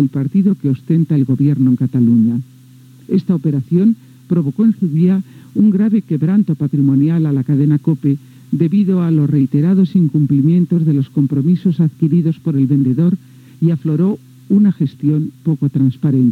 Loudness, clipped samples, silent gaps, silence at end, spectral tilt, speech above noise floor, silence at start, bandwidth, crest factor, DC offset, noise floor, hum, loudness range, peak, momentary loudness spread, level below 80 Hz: -15 LUFS; under 0.1%; none; 0 s; -11 dB/octave; 28 dB; 0 s; 4.5 kHz; 12 dB; under 0.1%; -42 dBFS; none; 2 LU; 0 dBFS; 5 LU; -62 dBFS